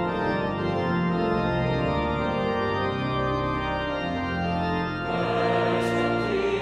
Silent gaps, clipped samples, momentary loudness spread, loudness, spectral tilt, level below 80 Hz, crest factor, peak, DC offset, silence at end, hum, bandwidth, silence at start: none; under 0.1%; 4 LU; -26 LUFS; -7 dB/octave; -42 dBFS; 12 dB; -12 dBFS; under 0.1%; 0 s; none; 11 kHz; 0 s